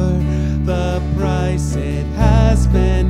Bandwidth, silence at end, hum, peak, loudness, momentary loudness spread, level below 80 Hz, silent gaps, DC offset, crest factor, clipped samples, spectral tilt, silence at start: 11.5 kHz; 0 s; none; 0 dBFS; -17 LUFS; 6 LU; -18 dBFS; none; under 0.1%; 14 dB; under 0.1%; -7.5 dB/octave; 0 s